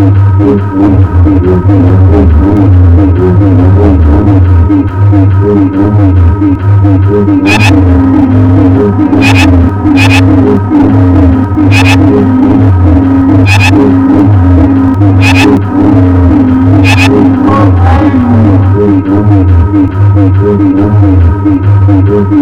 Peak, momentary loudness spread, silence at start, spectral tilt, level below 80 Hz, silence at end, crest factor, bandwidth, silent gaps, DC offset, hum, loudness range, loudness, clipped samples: 0 dBFS; 3 LU; 0 s; -8 dB/octave; -18 dBFS; 0 s; 4 dB; 9.4 kHz; none; under 0.1%; none; 1 LU; -5 LUFS; 2%